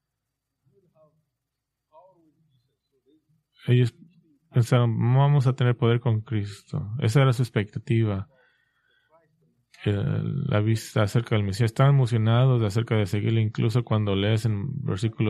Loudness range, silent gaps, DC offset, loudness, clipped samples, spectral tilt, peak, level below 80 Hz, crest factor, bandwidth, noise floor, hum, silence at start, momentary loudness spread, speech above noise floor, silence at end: 6 LU; none; under 0.1%; -24 LUFS; under 0.1%; -7.5 dB/octave; -8 dBFS; -60 dBFS; 18 dB; 12.5 kHz; -83 dBFS; none; 3.65 s; 9 LU; 60 dB; 0 s